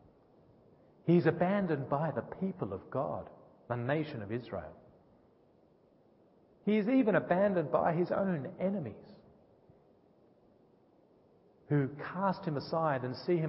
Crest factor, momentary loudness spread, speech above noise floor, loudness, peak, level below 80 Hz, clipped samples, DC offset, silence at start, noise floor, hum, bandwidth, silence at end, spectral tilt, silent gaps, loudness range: 20 dB; 12 LU; 34 dB; -33 LUFS; -14 dBFS; -68 dBFS; under 0.1%; under 0.1%; 1.05 s; -66 dBFS; none; 5.6 kHz; 0 s; -7 dB/octave; none; 9 LU